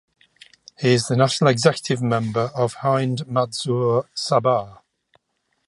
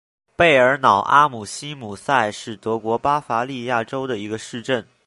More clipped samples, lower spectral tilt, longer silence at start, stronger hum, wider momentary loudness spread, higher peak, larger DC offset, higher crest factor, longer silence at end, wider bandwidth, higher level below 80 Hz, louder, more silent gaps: neither; about the same, -5.5 dB/octave vs -4.5 dB/octave; first, 0.8 s vs 0.4 s; neither; second, 6 LU vs 16 LU; about the same, -2 dBFS vs 0 dBFS; neither; about the same, 20 dB vs 20 dB; first, 0.95 s vs 0.25 s; about the same, 11.5 kHz vs 11.5 kHz; second, -62 dBFS vs -56 dBFS; about the same, -20 LUFS vs -19 LUFS; neither